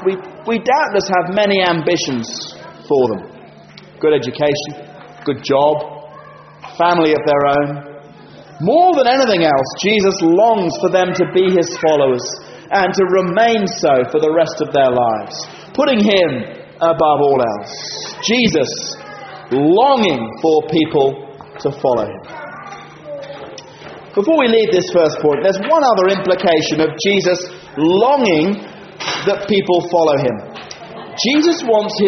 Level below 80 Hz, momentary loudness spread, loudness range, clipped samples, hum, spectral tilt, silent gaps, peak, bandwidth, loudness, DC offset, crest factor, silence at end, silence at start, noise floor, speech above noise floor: -54 dBFS; 18 LU; 5 LU; under 0.1%; none; -3.5 dB/octave; none; 0 dBFS; 6.4 kHz; -15 LUFS; under 0.1%; 14 dB; 0 s; 0 s; -39 dBFS; 25 dB